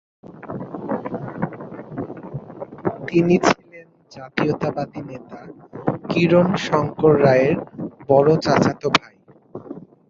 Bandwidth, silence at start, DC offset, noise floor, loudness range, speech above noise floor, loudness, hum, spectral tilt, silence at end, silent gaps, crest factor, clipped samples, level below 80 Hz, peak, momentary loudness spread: 7.8 kHz; 0.25 s; under 0.1%; -46 dBFS; 6 LU; 28 dB; -19 LUFS; none; -6.5 dB/octave; 0.3 s; none; 20 dB; under 0.1%; -54 dBFS; -2 dBFS; 21 LU